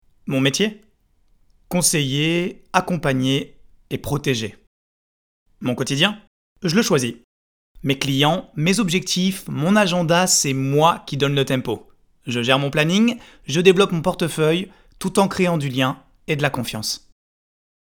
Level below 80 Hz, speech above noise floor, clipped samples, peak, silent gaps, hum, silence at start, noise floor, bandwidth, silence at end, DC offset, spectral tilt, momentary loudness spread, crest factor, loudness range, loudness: -50 dBFS; 40 dB; under 0.1%; 0 dBFS; 4.67-5.46 s, 6.27-6.56 s, 7.24-7.75 s; none; 0.25 s; -59 dBFS; over 20 kHz; 0.9 s; under 0.1%; -4 dB/octave; 11 LU; 20 dB; 5 LU; -20 LUFS